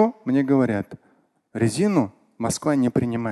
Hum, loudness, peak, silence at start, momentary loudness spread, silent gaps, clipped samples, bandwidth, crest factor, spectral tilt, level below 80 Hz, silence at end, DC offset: none; -22 LUFS; -6 dBFS; 0 s; 10 LU; none; under 0.1%; 12.5 kHz; 16 dB; -6.5 dB/octave; -54 dBFS; 0 s; under 0.1%